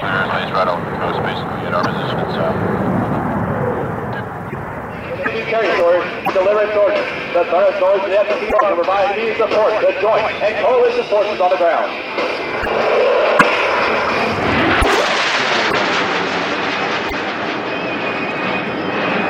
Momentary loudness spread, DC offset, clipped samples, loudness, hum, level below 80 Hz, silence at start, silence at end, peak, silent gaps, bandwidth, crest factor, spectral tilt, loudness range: 7 LU; under 0.1%; under 0.1%; -16 LUFS; none; -40 dBFS; 0 s; 0 s; 0 dBFS; none; 16 kHz; 16 dB; -5 dB/octave; 5 LU